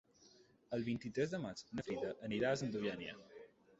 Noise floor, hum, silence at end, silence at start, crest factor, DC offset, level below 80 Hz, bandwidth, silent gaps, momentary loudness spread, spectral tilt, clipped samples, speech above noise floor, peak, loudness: -68 dBFS; none; 0.35 s; 0.2 s; 18 dB; under 0.1%; -72 dBFS; 8 kHz; none; 13 LU; -5 dB/octave; under 0.1%; 27 dB; -24 dBFS; -42 LUFS